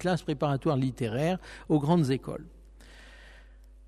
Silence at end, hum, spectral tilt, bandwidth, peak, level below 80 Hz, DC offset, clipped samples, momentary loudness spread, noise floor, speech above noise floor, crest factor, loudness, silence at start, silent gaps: 0.25 s; none; -7.5 dB/octave; 13 kHz; -14 dBFS; -52 dBFS; under 0.1%; under 0.1%; 10 LU; -52 dBFS; 24 dB; 16 dB; -28 LUFS; 0 s; none